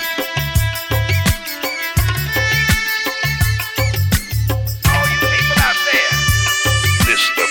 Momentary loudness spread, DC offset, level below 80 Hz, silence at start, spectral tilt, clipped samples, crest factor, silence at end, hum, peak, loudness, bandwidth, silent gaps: 6 LU; under 0.1%; -26 dBFS; 0 s; -3.5 dB/octave; under 0.1%; 16 dB; 0 s; none; 0 dBFS; -15 LUFS; 17.5 kHz; none